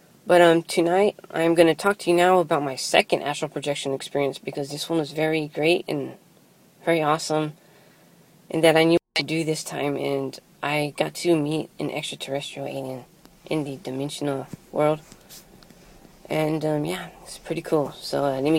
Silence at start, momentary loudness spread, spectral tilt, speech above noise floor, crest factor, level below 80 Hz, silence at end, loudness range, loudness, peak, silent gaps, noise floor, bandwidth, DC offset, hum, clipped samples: 0.25 s; 13 LU; -5 dB/octave; 32 dB; 22 dB; -62 dBFS; 0 s; 8 LU; -23 LUFS; -2 dBFS; none; -55 dBFS; 16.5 kHz; under 0.1%; none; under 0.1%